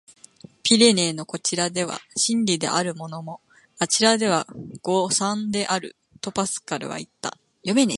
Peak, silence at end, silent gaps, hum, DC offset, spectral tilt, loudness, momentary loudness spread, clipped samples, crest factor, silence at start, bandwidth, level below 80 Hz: -2 dBFS; 0 s; none; none; under 0.1%; -3 dB/octave; -22 LUFS; 16 LU; under 0.1%; 22 dB; 0.65 s; 11.5 kHz; -66 dBFS